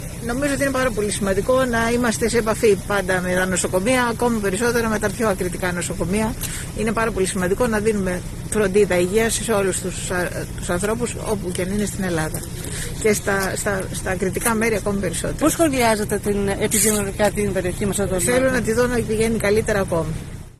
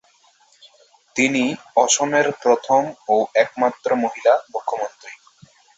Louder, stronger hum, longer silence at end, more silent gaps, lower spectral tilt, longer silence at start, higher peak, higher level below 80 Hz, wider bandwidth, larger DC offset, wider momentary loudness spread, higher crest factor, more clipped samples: about the same, -20 LUFS vs -19 LUFS; neither; second, 0.1 s vs 0.65 s; neither; first, -4.5 dB/octave vs -2.5 dB/octave; second, 0 s vs 1.15 s; about the same, -4 dBFS vs -2 dBFS; first, -34 dBFS vs -66 dBFS; first, 13.5 kHz vs 8.2 kHz; neither; second, 6 LU vs 11 LU; about the same, 16 dB vs 18 dB; neither